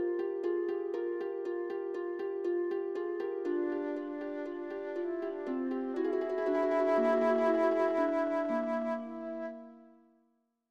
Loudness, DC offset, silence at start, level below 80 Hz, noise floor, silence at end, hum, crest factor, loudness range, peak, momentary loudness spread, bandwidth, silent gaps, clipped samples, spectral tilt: -33 LUFS; under 0.1%; 0 s; -76 dBFS; -75 dBFS; 0.8 s; none; 16 dB; 6 LU; -16 dBFS; 11 LU; 7.6 kHz; none; under 0.1%; -6 dB/octave